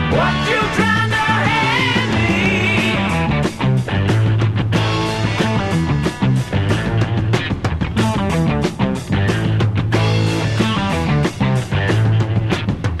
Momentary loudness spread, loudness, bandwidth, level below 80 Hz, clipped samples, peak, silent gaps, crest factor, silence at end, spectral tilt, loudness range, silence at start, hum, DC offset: 4 LU; -17 LUFS; 12.5 kHz; -32 dBFS; under 0.1%; -2 dBFS; none; 14 dB; 0 s; -6 dB/octave; 3 LU; 0 s; none; 0.5%